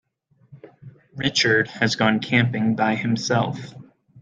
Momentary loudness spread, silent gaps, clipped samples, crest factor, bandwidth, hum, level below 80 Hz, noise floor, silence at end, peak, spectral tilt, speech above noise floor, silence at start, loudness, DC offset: 11 LU; none; under 0.1%; 20 dB; 9 kHz; none; -60 dBFS; -59 dBFS; 0 s; -2 dBFS; -4.5 dB/octave; 38 dB; 0.5 s; -21 LUFS; under 0.1%